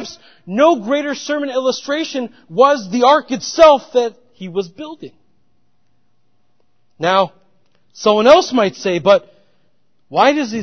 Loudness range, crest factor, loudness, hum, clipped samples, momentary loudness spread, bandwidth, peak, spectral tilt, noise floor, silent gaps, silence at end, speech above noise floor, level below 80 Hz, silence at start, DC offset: 9 LU; 16 dB; -15 LUFS; none; under 0.1%; 15 LU; 6.8 kHz; 0 dBFS; -4 dB/octave; -66 dBFS; none; 0 s; 52 dB; -56 dBFS; 0 s; 0.2%